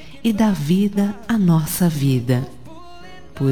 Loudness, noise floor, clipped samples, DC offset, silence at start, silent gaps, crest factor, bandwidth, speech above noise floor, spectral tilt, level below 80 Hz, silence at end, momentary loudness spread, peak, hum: -19 LUFS; -41 dBFS; under 0.1%; 1%; 0 s; none; 14 dB; 19 kHz; 24 dB; -6.5 dB/octave; -46 dBFS; 0 s; 6 LU; -4 dBFS; none